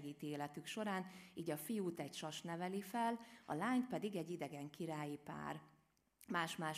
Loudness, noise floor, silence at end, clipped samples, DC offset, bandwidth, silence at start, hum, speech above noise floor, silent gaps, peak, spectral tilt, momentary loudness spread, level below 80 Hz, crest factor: -45 LUFS; -74 dBFS; 0 s; under 0.1%; under 0.1%; 15.5 kHz; 0 s; none; 29 dB; none; -26 dBFS; -5 dB/octave; 9 LU; -84 dBFS; 20 dB